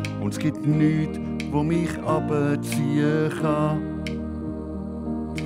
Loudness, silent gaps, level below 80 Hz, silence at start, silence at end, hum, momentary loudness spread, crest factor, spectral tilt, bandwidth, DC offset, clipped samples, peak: -25 LUFS; none; -42 dBFS; 0 s; 0 s; none; 10 LU; 14 dB; -7 dB/octave; 15.5 kHz; under 0.1%; under 0.1%; -10 dBFS